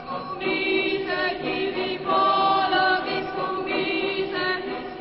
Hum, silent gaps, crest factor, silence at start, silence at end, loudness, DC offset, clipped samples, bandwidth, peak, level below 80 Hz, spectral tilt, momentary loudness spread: none; none; 16 dB; 0 s; 0 s; -24 LUFS; under 0.1%; under 0.1%; 5.8 kHz; -8 dBFS; -56 dBFS; -8.5 dB/octave; 8 LU